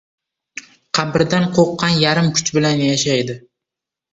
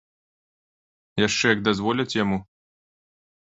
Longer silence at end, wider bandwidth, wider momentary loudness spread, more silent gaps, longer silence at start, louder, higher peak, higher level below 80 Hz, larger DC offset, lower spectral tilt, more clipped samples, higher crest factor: second, 0.75 s vs 1 s; about the same, 8.2 kHz vs 8.2 kHz; first, 20 LU vs 9 LU; neither; second, 0.55 s vs 1.15 s; first, -16 LUFS vs -23 LUFS; about the same, -2 dBFS vs -4 dBFS; about the same, -52 dBFS vs -56 dBFS; neither; about the same, -4.5 dB/octave vs -4 dB/octave; neither; second, 16 dB vs 24 dB